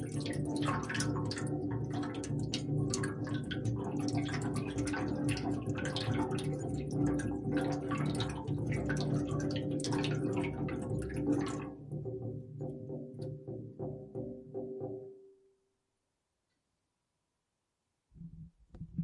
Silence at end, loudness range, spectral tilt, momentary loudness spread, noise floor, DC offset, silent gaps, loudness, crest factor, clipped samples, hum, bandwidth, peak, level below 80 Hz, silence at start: 0 s; 11 LU; -6 dB/octave; 10 LU; -85 dBFS; under 0.1%; none; -37 LUFS; 20 dB; under 0.1%; none; 11.5 kHz; -16 dBFS; -54 dBFS; 0 s